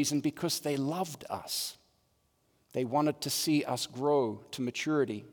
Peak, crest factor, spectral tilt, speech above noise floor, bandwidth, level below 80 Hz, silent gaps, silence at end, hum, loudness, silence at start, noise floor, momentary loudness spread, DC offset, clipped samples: -18 dBFS; 16 dB; -4 dB/octave; 41 dB; over 20 kHz; -76 dBFS; none; 0 s; none; -32 LUFS; 0 s; -73 dBFS; 8 LU; under 0.1%; under 0.1%